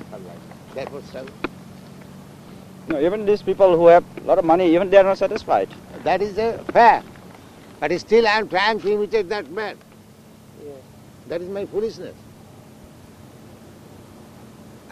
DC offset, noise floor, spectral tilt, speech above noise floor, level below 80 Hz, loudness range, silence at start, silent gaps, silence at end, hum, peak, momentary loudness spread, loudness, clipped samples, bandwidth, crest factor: under 0.1%; -46 dBFS; -5.5 dB/octave; 28 dB; -54 dBFS; 16 LU; 0 s; none; 0.9 s; none; 0 dBFS; 26 LU; -19 LUFS; under 0.1%; 14 kHz; 20 dB